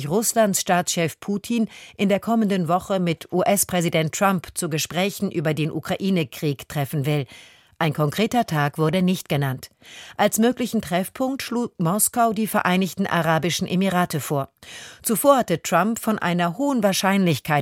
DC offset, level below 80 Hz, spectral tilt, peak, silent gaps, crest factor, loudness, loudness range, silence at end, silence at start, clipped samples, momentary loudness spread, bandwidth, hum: under 0.1%; -58 dBFS; -4.5 dB/octave; -2 dBFS; none; 20 dB; -22 LUFS; 3 LU; 0 s; 0 s; under 0.1%; 8 LU; 17 kHz; none